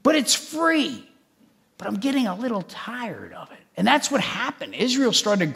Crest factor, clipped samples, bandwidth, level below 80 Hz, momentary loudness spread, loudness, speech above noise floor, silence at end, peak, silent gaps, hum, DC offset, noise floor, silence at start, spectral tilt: 22 dB; under 0.1%; 16 kHz; -70 dBFS; 17 LU; -22 LUFS; 37 dB; 0 s; -2 dBFS; none; none; under 0.1%; -60 dBFS; 0.05 s; -3 dB/octave